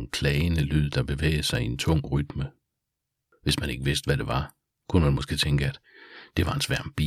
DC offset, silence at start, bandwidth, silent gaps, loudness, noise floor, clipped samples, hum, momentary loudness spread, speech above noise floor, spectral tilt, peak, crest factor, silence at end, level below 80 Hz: under 0.1%; 0 s; 15 kHz; none; -26 LUFS; -83 dBFS; under 0.1%; none; 9 LU; 57 dB; -5.5 dB/octave; -8 dBFS; 18 dB; 0 s; -36 dBFS